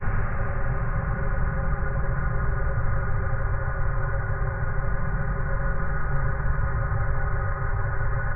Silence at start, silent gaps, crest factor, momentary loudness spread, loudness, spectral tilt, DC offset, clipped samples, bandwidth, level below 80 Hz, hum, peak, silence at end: 0 s; none; 12 dB; 1 LU; -28 LUFS; -13.5 dB/octave; 0.9%; under 0.1%; 2.7 kHz; -26 dBFS; none; -12 dBFS; 0 s